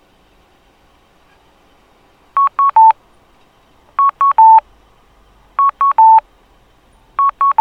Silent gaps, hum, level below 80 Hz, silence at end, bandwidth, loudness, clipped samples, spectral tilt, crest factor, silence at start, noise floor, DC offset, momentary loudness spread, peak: none; none; -54 dBFS; 0.1 s; 4.1 kHz; -11 LUFS; under 0.1%; -3.5 dB/octave; 14 dB; 2.35 s; -51 dBFS; under 0.1%; 14 LU; 0 dBFS